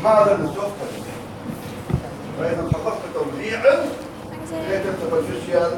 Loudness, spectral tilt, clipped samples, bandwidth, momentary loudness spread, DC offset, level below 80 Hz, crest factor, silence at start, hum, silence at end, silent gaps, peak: -23 LUFS; -6.5 dB/octave; under 0.1%; 17 kHz; 15 LU; under 0.1%; -44 dBFS; 18 dB; 0 s; none; 0 s; none; -4 dBFS